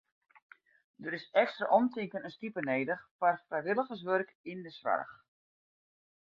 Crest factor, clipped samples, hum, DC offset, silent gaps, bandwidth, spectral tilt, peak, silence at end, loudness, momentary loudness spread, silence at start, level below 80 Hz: 22 dB; under 0.1%; none; under 0.1%; 3.11-3.19 s, 4.35-4.44 s; 6.8 kHz; -3.5 dB/octave; -14 dBFS; 1.2 s; -33 LUFS; 13 LU; 1 s; -82 dBFS